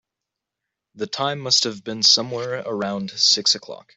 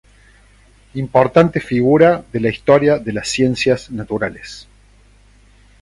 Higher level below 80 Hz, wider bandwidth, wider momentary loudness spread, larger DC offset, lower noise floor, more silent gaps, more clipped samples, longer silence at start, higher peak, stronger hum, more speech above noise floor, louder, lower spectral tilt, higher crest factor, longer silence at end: second, -68 dBFS vs -46 dBFS; second, 8.4 kHz vs 11.5 kHz; second, 12 LU vs 15 LU; neither; first, -84 dBFS vs -49 dBFS; neither; neither; about the same, 0.95 s vs 0.95 s; about the same, -2 dBFS vs 0 dBFS; second, none vs 50 Hz at -40 dBFS; first, 62 dB vs 34 dB; second, -19 LUFS vs -15 LUFS; second, -2 dB/octave vs -6 dB/octave; about the same, 20 dB vs 16 dB; second, 0.2 s vs 1.2 s